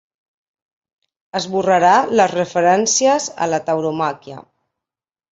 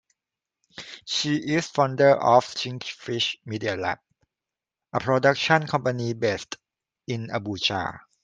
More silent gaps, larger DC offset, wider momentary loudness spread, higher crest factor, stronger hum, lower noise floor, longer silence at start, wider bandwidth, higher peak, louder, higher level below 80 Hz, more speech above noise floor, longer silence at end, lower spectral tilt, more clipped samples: neither; neither; second, 12 LU vs 16 LU; second, 16 dB vs 22 dB; neither; about the same, -88 dBFS vs -89 dBFS; first, 1.35 s vs 0.8 s; second, 8.2 kHz vs 9.4 kHz; about the same, -2 dBFS vs -2 dBFS; first, -16 LUFS vs -24 LUFS; about the same, -62 dBFS vs -64 dBFS; first, 72 dB vs 65 dB; first, 0.9 s vs 0.25 s; second, -3 dB/octave vs -4.5 dB/octave; neither